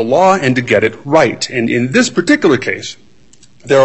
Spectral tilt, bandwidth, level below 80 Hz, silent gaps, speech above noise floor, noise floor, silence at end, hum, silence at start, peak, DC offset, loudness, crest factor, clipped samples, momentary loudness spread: -5 dB/octave; 8.6 kHz; -52 dBFS; none; 35 dB; -47 dBFS; 0 s; none; 0 s; 0 dBFS; 0.7%; -13 LUFS; 12 dB; under 0.1%; 7 LU